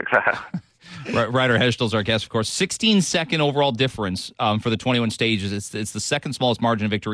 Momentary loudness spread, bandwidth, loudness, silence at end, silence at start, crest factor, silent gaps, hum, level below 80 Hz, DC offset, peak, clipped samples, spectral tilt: 9 LU; 11 kHz; -21 LUFS; 0 s; 0 s; 18 dB; none; none; -54 dBFS; under 0.1%; -2 dBFS; under 0.1%; -4.5 dB/octave